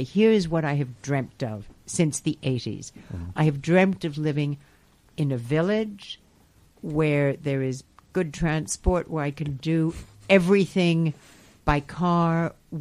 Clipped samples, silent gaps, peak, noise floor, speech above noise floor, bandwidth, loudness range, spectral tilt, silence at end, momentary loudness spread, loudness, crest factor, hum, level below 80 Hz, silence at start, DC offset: under 0.1%; none; -4 dBFS; -58 dBFS; 34 dB; 13 kHz; 4 LU; -6 dB/octave; 0 s; 17 LU; -25 LUFS; 20 dB; none; -42 dBFS; 0 s; under 0.1%